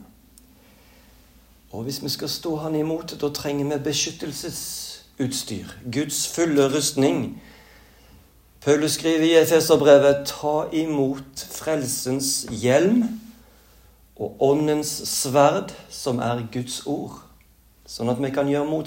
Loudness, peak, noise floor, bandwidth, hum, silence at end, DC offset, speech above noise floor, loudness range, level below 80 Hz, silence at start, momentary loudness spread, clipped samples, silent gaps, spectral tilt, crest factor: -22 LUFS; -2 dBFS; -55 dBFS; 16.5 kHz; none; 0 s; under 0.1%; 33 dB; 8 LU; -56 dBFS; 0 s; 15 LU; under 0.1%; none; -4 dB/octave; 20 dB